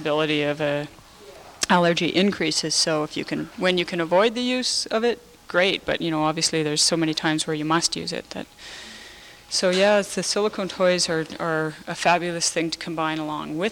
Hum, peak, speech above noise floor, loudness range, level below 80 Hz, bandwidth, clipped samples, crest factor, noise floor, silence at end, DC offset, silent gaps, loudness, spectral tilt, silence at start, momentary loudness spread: none; -6 dBFS; 22 dB; 2 LU; -58 dBFS; 17 kHz; under 0.1%; 18 dB; -45 dBFS; 0 s; under 0.1%; none; -22 LUFS; -3 dB/octave; 0 s; 11 LU